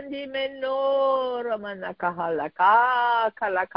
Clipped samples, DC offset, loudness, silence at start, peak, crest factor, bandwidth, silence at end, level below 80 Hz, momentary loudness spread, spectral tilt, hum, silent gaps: under 0.1%; under 0.1%; -24 LUFS; 0 s; -8 dBFS; 18 dB; 5.4 kHz; 0.1 s; -66 dBFS; 11 LU; -8 dB/octave; none; none